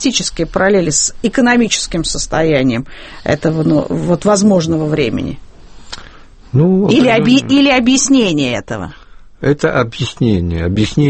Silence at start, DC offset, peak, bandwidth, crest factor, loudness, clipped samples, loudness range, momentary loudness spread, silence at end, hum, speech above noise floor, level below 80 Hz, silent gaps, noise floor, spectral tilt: 0 s; under 0.1%; 0 dBFS; 8.8 kHz; 14 dB; -13 LUFS; under 0.1%; 3 LU; 14 LU; 0 s; none; 24 dB; -34 dBFS; none; -36 dBFS; -4.5 dB/octave